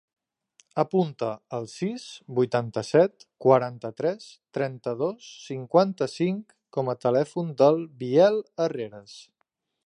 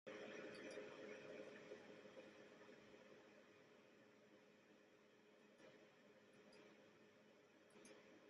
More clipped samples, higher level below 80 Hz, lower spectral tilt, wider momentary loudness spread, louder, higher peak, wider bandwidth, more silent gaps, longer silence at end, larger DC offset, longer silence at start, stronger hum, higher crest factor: neither; first, -74 dBFS vs under -90 dBFS; first, -7 dB/octave vs -4 dB/octave; about the same, 15 LU vs 13 LU; first, -25 LUFS vs -61 LUFS; first, -6 dBFS vs -44 dBFS; about the same, 11 kHz vs 10.5 kHz; neither; first, 0.65 s vs 0 s; neither; first, 0.75 s vs 0.05 s; neither; about the same, 20 dB vs 20 dB